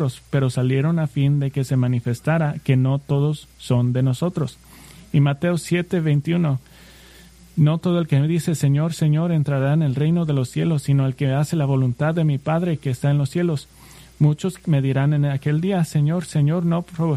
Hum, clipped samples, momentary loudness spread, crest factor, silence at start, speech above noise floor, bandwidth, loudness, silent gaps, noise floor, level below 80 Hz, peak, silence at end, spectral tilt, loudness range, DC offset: none; under 0.1%; 4 LU; 14 dB; 0 s; 27 dB; 13 kHz; -21 LUFS; none; -46 dBFS; -52 dBFS; -6 dBFS; 0 s; -7.5 dB/octave; 2 LU; under 0.1%